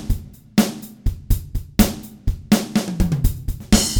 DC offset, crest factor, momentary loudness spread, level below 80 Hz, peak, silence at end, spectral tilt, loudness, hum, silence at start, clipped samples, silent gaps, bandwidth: under 0.1%; 20 dB; 10 LU; -26 dBFS; 0 dBFS; 0 s; -4.5 dB/octave; -22 LUFS; none; 0 s; under 0.1%; none; over 20 kHz